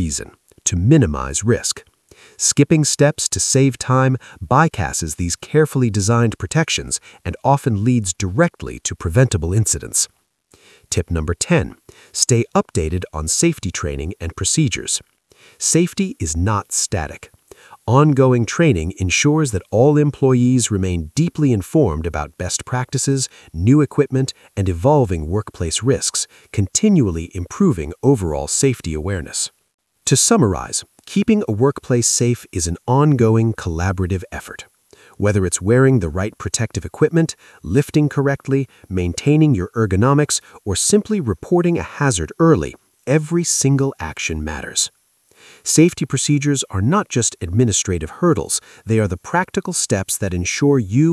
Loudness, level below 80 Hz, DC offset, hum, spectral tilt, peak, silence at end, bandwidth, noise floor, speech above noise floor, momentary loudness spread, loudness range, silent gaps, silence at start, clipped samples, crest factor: -18 LUFS; -40 dBFS; under 0.1%; none; -5 dB/octave; 0 dBFS; 0 s; 12 kHz; -55 dBFS; 38 dB; 9 LU; 3 LU; 29.74-29.78 s; 0 s; under 0.1%; 18 dB